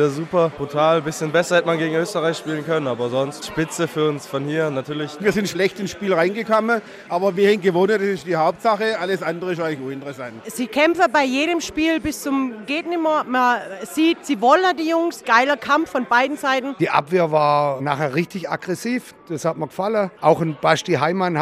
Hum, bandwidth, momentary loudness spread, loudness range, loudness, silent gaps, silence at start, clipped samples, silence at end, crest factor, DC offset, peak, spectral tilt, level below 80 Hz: none; 15.5 kHz; 9 LU; 4 LU; -20 LUFS; none; 0 s; under 0.1%; 0 s; 18 dB; under 0.1%; -2 dBFS; -5 dB/octave; -58 dBFS